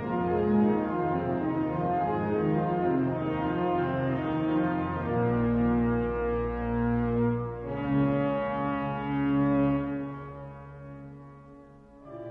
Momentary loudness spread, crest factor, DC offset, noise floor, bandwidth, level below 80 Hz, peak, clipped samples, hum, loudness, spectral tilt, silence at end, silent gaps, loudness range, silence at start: 16 LU; 14 dB; under 0.1%; -51 dBFS; 4.7 kHz; -46 dBFS; -14 dBFS; under 0.1%; none; -28 LUFS; -10.5 dB/octave; 0 s; none; 3 LU; 0 s